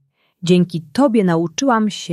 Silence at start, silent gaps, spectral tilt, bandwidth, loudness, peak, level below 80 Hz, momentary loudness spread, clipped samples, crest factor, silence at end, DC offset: 0.45 s; none; -6 dB/octave; 12 kHz; -16 LUFS; -2 dBFS; -60 dBFS; 4 LU; under 0.1%; 14 dB; 0 s; under 0.1%